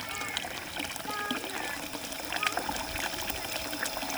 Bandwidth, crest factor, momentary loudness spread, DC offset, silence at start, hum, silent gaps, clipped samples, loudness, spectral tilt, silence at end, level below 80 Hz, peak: over 20 kHz; 26 dB; 5 LU; under 0.1%; 0 s; none; none; under 0.1%; -33 LUFS; -1.5 dB/octave; 0 s; -54 dBFS; -10 dBFS